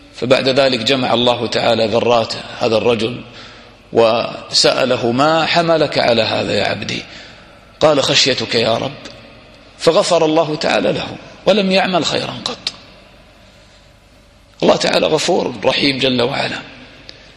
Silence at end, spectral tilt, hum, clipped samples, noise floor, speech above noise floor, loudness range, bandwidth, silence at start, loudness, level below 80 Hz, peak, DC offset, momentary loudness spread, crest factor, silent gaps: 0.5 s; -4 dB/octave; none; under 0.1%; -46 dBFS; 31 dB; 4 LU; 12.5 kHz; 0.15 s; -15 LUFS; -50 dBFS; 0 dBFS; under 0.1%; 11 LU; 16 dB; none